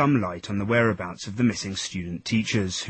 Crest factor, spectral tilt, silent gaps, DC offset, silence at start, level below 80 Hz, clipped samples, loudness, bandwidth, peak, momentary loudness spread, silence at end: 16 dB; -5 dB/octave; none; under 0.1%; 0 s; -54 dBFS; under 0.1%; -25 LUFS; 8.8 kHz; -8 dBFS; 9 LU; 0 s